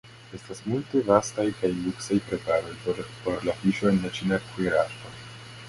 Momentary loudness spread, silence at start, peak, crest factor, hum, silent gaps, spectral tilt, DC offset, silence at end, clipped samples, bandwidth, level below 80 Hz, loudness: 18 LU; 0.05 s; -4 dBFS; 22 dB; none; none; -5.5 dB/octave; under 0.1%; 0 s; under 0.1%; 11.5 kHz; -54 dBFS; -27 LUFS